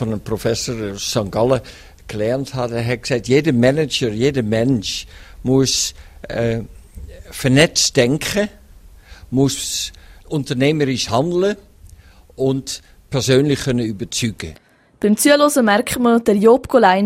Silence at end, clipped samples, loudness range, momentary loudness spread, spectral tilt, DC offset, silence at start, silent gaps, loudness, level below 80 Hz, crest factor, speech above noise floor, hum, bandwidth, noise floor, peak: 0 s; under 0.1%; 4 LU; 13 LU; -4.5 dB/octave; under 0.1%; 0 s; none; -17 LUFS; -42 dBFS; 18 dB; 27 dB; none; 16 kHz; -44 dBFS; 0 dBFS